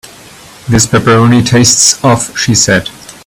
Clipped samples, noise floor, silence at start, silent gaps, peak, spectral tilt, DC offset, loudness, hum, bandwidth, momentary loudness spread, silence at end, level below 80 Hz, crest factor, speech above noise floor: 0.4%; -34 dBFS; 0.05 s; none; 0 dBFS; -3.5 dB/octave; under 0.1%; -7 LUFS; none; over 20 kHz; 8 LU; 0.15 s; -36 dBFS; 10 dB; 26 dB